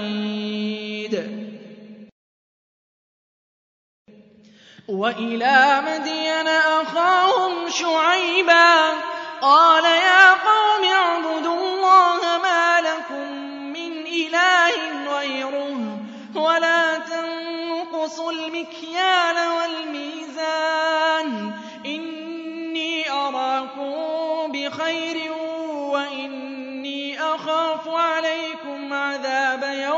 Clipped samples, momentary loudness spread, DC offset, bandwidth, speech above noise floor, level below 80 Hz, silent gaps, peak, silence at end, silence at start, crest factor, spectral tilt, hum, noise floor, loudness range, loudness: under 0.1%; 16 LU; under 0.1%; 7.8 kHz; 32 dB; -80 dBFS; 2.12-4.05 s; 0 dBFS; 0 s; 0 s; 20 dB; -2.5 dB/octave; none; -50 dBFS; 11 LU; -19 LUFS